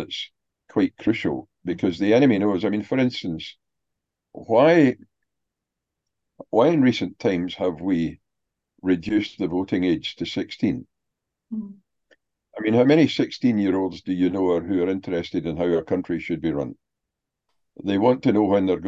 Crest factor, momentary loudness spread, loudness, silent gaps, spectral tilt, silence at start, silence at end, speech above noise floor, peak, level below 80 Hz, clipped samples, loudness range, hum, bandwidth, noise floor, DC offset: 18 dB; 14 LU; -22 LUFS; none; -7 dB/octave; 0 s; 0 s; 62 dB; -4 dBFS; -54 dBFS; under 0.1%; 5 LU; none; 7.6 kHz; -84 dBFS; under 0.1%